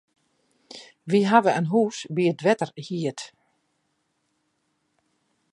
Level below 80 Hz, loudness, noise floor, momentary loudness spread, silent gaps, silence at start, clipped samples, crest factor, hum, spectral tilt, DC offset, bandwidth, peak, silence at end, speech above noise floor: -78 dBFS; -23 LUFS; -73 dBFS; 23 LU; none; 0.75 s; under 0.1%; 24 dB; none; -6 dB/octave; under 0.1%; 11.5 kHz; -2 dBFS; 2.25 s; 51 dB